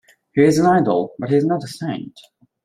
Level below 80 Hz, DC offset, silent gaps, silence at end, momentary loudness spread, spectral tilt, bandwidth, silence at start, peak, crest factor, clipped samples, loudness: -58 dBFS; under 0.1%; none; 0.45 s; 13 LU; -7 dB/octave; 15.5 kHz; 0.35 s; -2 dBFS; 16 dB; under 0.1%; -18 LUFS